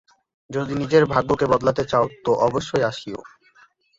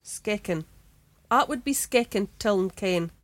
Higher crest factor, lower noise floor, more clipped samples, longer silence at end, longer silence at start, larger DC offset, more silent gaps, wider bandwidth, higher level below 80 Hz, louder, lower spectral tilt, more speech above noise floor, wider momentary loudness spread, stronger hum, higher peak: about the same, 20 dB vs 18 dB; about the same, -56 dBFS vs -59 dBFS; neither; first, 0.7 s vs 0.15 s; first, 0.5 s vs 0.05 s; neither; neither; second, 7.8 kHz vs 17 kHz; about the same, -50 dBFS vs -54 dBFS; first, -21 LUFS vs -26 LUFS; first, -6 dB/octave vs -4 dB/octave; about the same, 36 dB vs 33 dB; first, 13 LU vs 6 LU; neither; first, -2 dBFS vs -8 dBFS